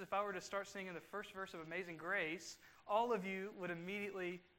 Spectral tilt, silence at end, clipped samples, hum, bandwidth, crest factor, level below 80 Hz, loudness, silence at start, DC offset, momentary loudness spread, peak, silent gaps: -4.5 dB/octave; 0.15 s; under 0.1%; none; 16 kHz; 20 dB; -82 dBFS; -44 LUFS; 0 s; under 0.1%; 10 LU; -24 dBFS; none